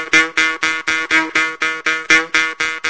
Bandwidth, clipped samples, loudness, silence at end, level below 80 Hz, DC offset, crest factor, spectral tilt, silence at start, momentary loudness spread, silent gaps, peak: 8 kHz; under 0.1%; -15 LUFS; 0 s; -54 dBFS; under 0.1%; 16 dB; -0.5 dB/octave; 0 s; 6 LU; none; 0 dBFS